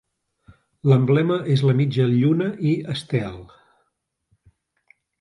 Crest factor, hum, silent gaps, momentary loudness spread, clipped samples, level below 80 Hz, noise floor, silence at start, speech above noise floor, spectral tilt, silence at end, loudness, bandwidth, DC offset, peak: 18 dB; none; none; 9 LU; under 0.1%; -56 dBFS; -74 dBFS; 0.85 s; 55 dB; -8.5 dB/octave; 1.75 s; -20 LUFS; 11 kHz; under 0.1%; -4 dBFS